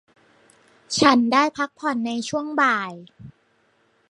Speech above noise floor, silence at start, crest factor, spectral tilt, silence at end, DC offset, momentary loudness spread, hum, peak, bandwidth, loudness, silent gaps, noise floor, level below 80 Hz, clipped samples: 42 dB; 0.9 s; 22 dB; -3.5 dB/octave; 0.8 s; under 0.1%; 10 LU; none; 0 dBFS; 11.5 kHz; -21 LUFS; none; -63 dBFS; -64 dBFS; under 0.1%